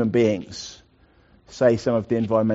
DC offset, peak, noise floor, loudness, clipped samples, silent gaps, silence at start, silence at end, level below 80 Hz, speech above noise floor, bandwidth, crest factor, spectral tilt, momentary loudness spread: under 0.1%; -6 dBFS; -57 dBFS; -22 LUFS; under 0.1%; none; 0 s; 0 s; -56 dBFS; 36 dB; 8 kHz; 16 dB; -6.5 dB/octave; 17 LU